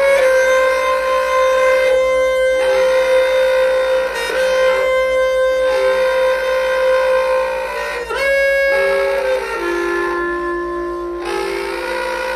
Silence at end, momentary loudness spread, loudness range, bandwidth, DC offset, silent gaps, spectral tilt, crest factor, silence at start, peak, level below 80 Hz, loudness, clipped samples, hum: 0 s; 8 LU; 3 LU; 14 kHz; under 0.1%; none; -3 dB/octave; 12 dB; 0 s; -4 dBFS; -42 dBFS; -15 LUFS; under 0.1%; none